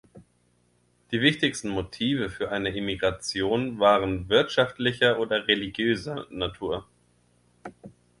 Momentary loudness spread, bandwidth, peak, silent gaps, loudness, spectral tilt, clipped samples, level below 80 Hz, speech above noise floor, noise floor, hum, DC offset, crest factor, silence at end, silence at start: 11 LU; 11.5 kHz; -6 dBFS; none; -25 LUFS; -4.5 dB/octave; under 0.1%; -52 dBFS; 41 dB; -66 dBFS; 60 Hz at -50 dBFS; under 0.1%; 22 dB; 0.3 s; 0.15 s